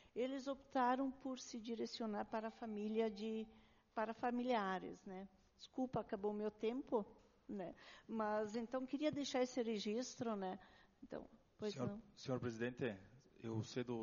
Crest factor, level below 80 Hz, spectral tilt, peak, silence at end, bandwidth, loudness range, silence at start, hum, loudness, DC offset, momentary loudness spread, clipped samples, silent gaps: 18 dB; -76 dBFS; -4.5 dB/octave; -26 dBFS; 0 s; 7.2 kHz; 3 LU; 0 s; none; -45 LUFS; under 0.1%; 14 LU; under 0.1%; none